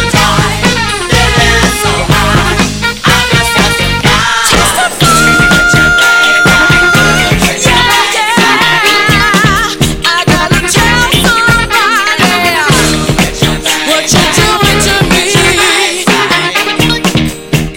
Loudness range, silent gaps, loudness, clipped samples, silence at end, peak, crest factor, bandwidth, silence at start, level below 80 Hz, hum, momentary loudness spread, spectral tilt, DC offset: 2 LU; none; -7 LUFS; 1%; 0 s; 0 dBFS; 8 dB; 17 kHz; 0 s; -22 dBFS; none; 5 LU; -3 dB/octave; under 0.1%